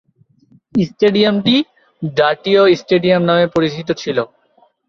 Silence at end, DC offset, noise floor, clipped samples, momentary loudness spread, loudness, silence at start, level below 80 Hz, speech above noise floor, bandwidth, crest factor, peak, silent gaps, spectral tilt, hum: 0.65 s; under 0.1%; -55 dBFS; under 0.1%; 9 LU; -15 LUFS; 0.75 s; -54 dBFS; 41 dB; 7.2 kHz; 14 dB; -2 dBFS; none; -6.5 dB/octave; none